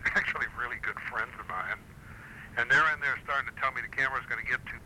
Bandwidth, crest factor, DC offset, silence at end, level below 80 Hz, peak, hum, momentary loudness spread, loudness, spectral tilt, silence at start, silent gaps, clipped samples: 16 kHz; 16 dB; under 0.1%; 0 s; -54 dBFS; -14 dBFS; none; 14 LU; -30 LUFS; -3.5 dB/octave; 0 s; none; under 0.1%